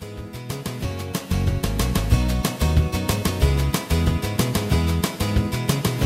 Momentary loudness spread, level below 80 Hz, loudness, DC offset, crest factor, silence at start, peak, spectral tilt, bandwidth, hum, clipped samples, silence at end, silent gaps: 8 LU; -26 dBFS; -23 LUFS; under 0.1%; 18 dB; 0 s; -4 dBFS; -5.5 dB/octave; 16 kHz; none; under 0.1%; 0 s; none